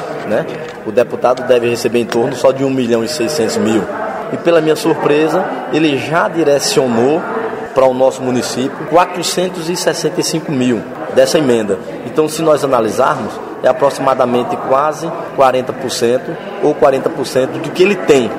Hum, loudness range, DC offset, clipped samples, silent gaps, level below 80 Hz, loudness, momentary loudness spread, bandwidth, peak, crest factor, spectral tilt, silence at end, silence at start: none; 1 LU; under 0.1%; under 0.1%; none; -52 dBFS; -14 LUFS; 7 LU; 16 kHz; 0 dBFS; 14 dB; -4.5 dB/octave; 0 s; 0 s